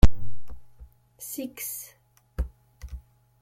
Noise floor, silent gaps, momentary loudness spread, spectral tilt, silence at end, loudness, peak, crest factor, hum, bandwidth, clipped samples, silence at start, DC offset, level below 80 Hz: -60 dBFS; none; 19 LU; -5.5 dB/octave; 0.45 s; -35 LUFS; -2 dBFS; 20 dB; none; 16.5 kHz; under 0.1%; 0.05 s; under 0.1%; -30 dBFS